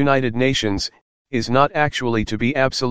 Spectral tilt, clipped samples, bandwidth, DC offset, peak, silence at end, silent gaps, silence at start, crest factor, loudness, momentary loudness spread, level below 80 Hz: -5 dB/octave; under 0.1%; 9.8 kHz; 2%; 0 dBFS; 0 s; 1.01-1.25 s; 0 s; 18 dB; -20 LUFS; 8 LU; -44 dBFS